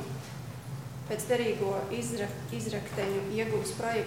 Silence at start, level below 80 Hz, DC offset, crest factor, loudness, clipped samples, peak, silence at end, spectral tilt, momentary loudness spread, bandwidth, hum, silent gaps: 0 s; -60 dBFS; 0.1%; 16 dB; -33 LUFS; under 0.1%; -16 dBFS; 0 s; -5 dB/octave; 12 LU; 16.5 kHz; none; none